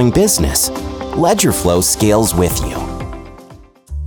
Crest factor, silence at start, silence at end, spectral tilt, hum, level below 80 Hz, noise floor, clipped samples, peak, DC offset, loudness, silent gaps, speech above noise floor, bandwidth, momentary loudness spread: 14 dB; 0 s; 0 s; -4.5 dB/octave; none; -28 dBFS; -40 dBFS; under 0.1%; -2 dBFS; under 0.1%; -14 LUFS; none; 27 dB; over 20 kHz; 15 LU